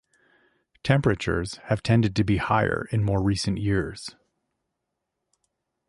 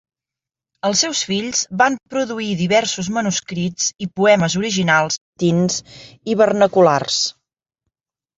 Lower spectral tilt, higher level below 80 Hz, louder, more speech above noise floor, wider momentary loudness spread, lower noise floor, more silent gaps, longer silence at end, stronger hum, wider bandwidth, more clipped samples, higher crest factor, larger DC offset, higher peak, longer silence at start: first, -6.5 dB/octave vs -3.5 dB/octave; first, -44 dBFS vs -56 dBFS; second, -25 LUFS vs -18 LUFS; second, 58 dB vs 70 dB; about the same, 9 LU vs 9 LU; second, -81 dBFS vs -88 dBFS; second, none vs 5.21-5.33 s; first, 1.8 s vs 1.05 s; neither; first, 11.5 kHz vs 8 kHz; neither; about the same, 18 dB vs 18 dB; neither; second, -8 dBFS vs -2 dBFS; about the same, 0.85 s vs 0.85 s